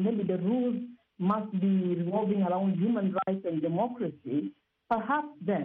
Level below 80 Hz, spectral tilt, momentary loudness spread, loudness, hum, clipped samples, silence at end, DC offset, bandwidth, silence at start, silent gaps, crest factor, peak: -72 dBFS; -8 dB/octave; 6 LU; -30 LUFS; none; under 0.1%; 0 s; under 0.1%; 3.9 kHz; 0 s; none; 16 dB; -14 dBFS